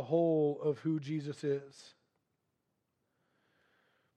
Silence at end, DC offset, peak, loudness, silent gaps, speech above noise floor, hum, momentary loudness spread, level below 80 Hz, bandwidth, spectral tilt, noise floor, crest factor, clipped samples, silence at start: 2.3 s; under 0.1%; -18 dBFS; -34 LUFS; none; 49 dB; none; 9 LU; -88 dBFS; 9.2 kHz; -8 dB/octave; -83 dBFS; 18 dB; under 0.1%; 0 s